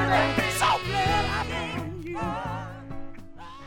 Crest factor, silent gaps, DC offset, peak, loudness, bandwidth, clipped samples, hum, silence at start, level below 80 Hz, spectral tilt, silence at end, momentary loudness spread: 18 dB; none; under 0.1%; -8 dBFS; -26 LUFS; 17.5 kHz; under 0.1%; none; 0 s; -42 dBFS; -4.5 dB/octave; 0 s; 20 LU